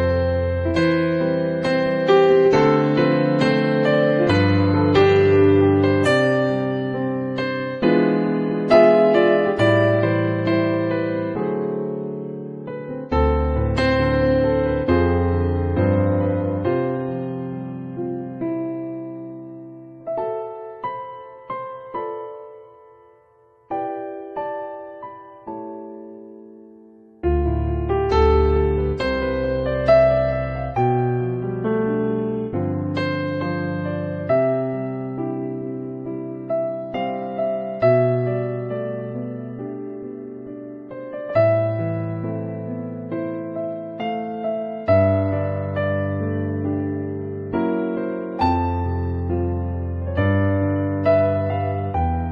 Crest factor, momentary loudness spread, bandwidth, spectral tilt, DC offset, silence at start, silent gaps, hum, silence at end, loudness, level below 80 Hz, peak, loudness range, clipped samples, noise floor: 18 dB; 15 LU; 9.4 kHz; -8.5 dB/octave; under 0.1%; 0 s; none; none; 0 s; -21 LUFS; -34 dBFS; -2 dBFS; 14 LU; under 0.1%; -55 dBFS